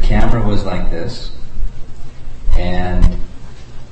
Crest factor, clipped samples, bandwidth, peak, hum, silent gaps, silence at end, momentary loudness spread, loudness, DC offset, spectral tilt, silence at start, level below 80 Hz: 12 dB; under 0.1%; 5.6 kHz; 0 dBFS; none; none; 0 s; 20 LU; -21 LUFS; under 0.1%; -7 dB/octave; 0 s; -16 dBFS